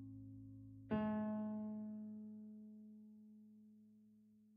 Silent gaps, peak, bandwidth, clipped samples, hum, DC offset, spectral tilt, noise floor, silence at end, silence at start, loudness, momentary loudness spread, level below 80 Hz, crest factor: none; -28 dBFS; 3.7 kHz; under 0.1%; none; under 0.1%; -8 dB/octave; -69 dBFS; 0 s; 0 s; -47 LUFS; 23 LU; -76 dBFS; 22 dB